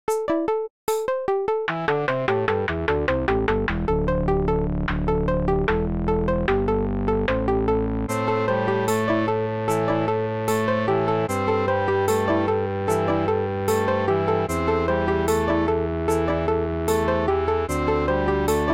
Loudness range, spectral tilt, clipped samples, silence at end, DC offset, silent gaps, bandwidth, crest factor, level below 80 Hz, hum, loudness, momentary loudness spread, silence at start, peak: 1 LU; -6.5 dB/octave; under 0.1%; 0 s; 0.3%; 0.70-0.87 s; 16.5 kHz; 16 dB; -36 dBFS; none; -23 LUFS; 2 LU; 0.1 s; -6 dBFS